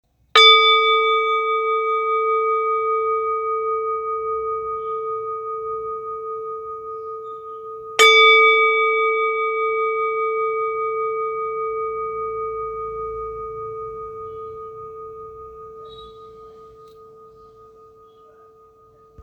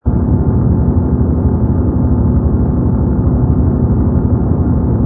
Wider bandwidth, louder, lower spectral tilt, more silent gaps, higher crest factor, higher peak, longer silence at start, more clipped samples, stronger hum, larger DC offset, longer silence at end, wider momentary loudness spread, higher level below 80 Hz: first, 13.5 kHz vs 2 kHz; second, -18 LUFS vs -13 LUFS; second, 0 dB/octave vs -15.5 dB/octave; neither; first, 22 dB vs 12 dB; about the same, 0 dBFS vs 0 dBFS; first, 0.35 s vs 0.05 s; neither; neither; neither; about the same, 0 s vs 0 s; first, 22 LU vs 1 LU; second, -56 dBFS vs -18 dBFS